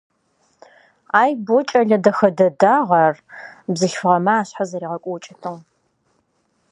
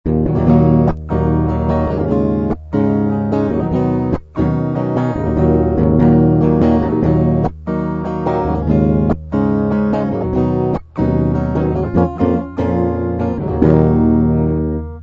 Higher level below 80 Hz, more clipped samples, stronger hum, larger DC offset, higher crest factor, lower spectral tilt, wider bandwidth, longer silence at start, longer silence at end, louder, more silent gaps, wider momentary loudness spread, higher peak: second, -70 dBFS vs -28 dBFS; neither; neither; neither; about the same, 18 dB vs 14 dB; second, -5.5 dB/octave vs -11 dB/octave; first, 10.5 kHz vs 5.6 kHz; first, 1.15 s vs 0.05 s; first, 1.1 s vs 0 s; about the same, -17 LUFS vs -15 LUFS; neither; first, 17 LU vs 7 LU; about the same, 0 dBFS vs -2 dBFS